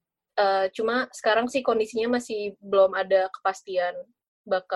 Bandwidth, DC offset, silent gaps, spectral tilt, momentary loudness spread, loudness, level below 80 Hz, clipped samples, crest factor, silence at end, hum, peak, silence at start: 12 kHz; under 0.1%; 4.28-4.44 s; -3.5 dB/octave; 9 LU; -25 LUFS; -70 dBFS; under 0.1%; 16 dB; 0 s; none; -8 dBFS; 0.35 s